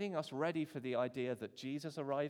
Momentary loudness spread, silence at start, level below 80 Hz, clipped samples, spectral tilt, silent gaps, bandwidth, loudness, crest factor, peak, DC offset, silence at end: 5 LU; 0 s; -88 dBFS; under 0.1%; -6.5 dB/octave; none; 17 kHz; -41 LUFS; 16 dB; -24 dBFS; under 0.1%; 0 s